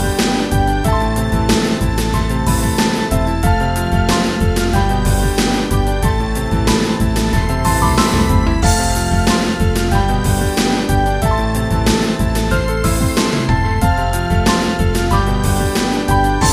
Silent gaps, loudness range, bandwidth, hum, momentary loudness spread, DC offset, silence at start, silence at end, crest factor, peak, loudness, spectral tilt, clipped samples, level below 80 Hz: none; 1 LU; 15.5 kHz; none; 3 LU; 0.2%; 0 s; 0 s; 14 dB; 0 dBFS; -16 LUFS; -5 dB/octave; under 0.1%; -20 dBFS